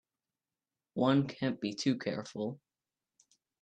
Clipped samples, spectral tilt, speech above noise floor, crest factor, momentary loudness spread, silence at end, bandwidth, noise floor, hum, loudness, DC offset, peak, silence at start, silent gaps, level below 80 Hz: under 0.1%; -6 dB/octave; over 57 dB; 20 dB; 12 LU; 1.05 s; 9 kHz; under -90 dBFS; none; -34 LUFS; under 0.1%; -16 dBFS; 0.95 s; none; -76 dBFS